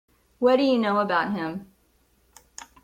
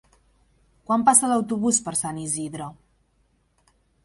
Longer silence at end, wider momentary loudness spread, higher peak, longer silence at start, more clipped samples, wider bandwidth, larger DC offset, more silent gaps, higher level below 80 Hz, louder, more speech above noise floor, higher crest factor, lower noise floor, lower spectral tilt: second, 0.2 s vs 1.3 s; first, 23 LU vs 17 LU; second, -8 dBFS vs -2 dBFS; second, 0.4 s vs 0.9 s; neither; about the same, 13 kHz vs 12 kHz; neither; neither; about the same, -64 dBFS vs -62 dBFS; about the same, -23 LUFS vs -21 LUFS; about the same, 42 dB vs 44 dB; second, 18 dB vs 24 dB; about the same, -64 dBFS vs -66 dBFS; first, -5.5 dB/octave vs -3.5 dB/octave